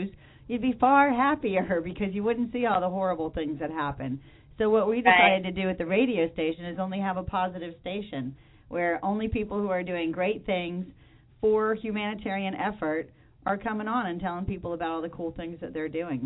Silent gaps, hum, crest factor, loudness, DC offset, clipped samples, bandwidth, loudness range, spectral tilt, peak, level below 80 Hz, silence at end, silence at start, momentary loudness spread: none; none; 22 dB; -27 LUFS; under 0.1%; under 0.1%; 4.1 kHz; 6 LU; -9.5 dB/octave; -6 dBFS; -50 dBFS; 0 s; 0 s; 14 LU